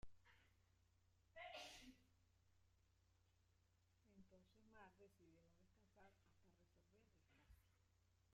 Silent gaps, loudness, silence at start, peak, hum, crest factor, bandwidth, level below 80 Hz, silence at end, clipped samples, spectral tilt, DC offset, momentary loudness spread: none; -62 LUFS; 0 s; -46 dBFS; none; 22 dB; 12.5 kHz; -80 dBFS; 0 s; under 0.1%; -3 dB/octave; under 0.1%; 12 LU